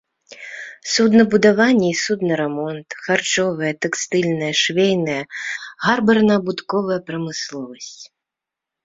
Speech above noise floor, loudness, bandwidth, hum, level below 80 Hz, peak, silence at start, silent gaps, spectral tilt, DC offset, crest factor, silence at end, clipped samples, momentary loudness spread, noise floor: 67 dB; -18 LUFS; 7.8 kHz; none; -60 dBFS; -2 dBFS; 0.3 s; none; -4 dB/octave; under 0.1%; 18 dB; 0.8 s; under 0.1%; 17 LU; -85 dBFS